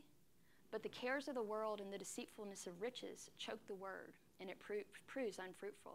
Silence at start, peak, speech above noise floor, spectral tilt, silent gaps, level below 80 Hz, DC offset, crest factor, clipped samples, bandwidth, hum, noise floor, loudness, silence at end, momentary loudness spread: 0 s; -30 dBFS; 26 dB; -3 dB/octave; none; -86 dBFS; under 0.1%; 18 dB; under 0.1%; 16 kHz; none; -75 dBFS; -49 LUFS; 0 s; 10 LU